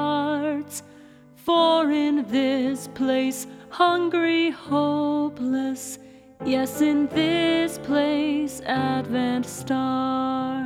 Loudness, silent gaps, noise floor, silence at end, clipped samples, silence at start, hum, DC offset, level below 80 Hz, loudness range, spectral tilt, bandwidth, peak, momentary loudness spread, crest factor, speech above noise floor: -23 LUFS; none; -48 dBFS; 0 s; under 0.1%; 0 s; none; under 0.1%; -60 dBFS; 2 LU; -4.5 dB/octave; 16 kHz; -8 dBFS; 9 LU; 16 dB; 26 dB